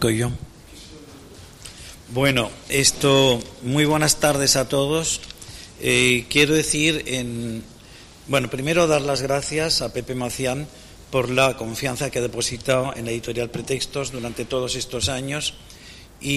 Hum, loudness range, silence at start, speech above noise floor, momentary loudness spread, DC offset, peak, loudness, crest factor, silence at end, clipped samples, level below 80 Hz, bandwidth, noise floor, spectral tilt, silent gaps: none; 6 LU; 0 s; 23 dB; 20 LU; under 0.1%; -4 dBFS; -21 LUFS; 18 dB; 0 s; under 0.1%; -44 dBFS; 15.5 kHz; -44 dBFS; -3.5 dB/octave; none